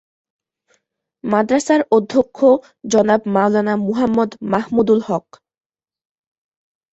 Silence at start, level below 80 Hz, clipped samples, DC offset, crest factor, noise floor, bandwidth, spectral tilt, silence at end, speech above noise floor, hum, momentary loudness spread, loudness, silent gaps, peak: 1.25 s; -56 dBFS; under 0.1%; under 0.1%; 16 dB; -67 dBFS; 8.2 kHz; -6 dB/octave; 1.75 s; 51 dB; none; 5 LU; -17 LUFS; none; -2 dBFS